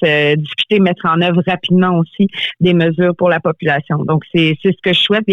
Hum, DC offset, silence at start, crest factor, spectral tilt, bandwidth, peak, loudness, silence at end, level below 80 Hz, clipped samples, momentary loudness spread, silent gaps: none; under 0.1%; 0 s; 10 dB; -7.5 dB/octave; 6.8 kHz; -4 dBFS; -14 LUFS; 0 s; -54 dBFS; under 0.1%; 4 LU; none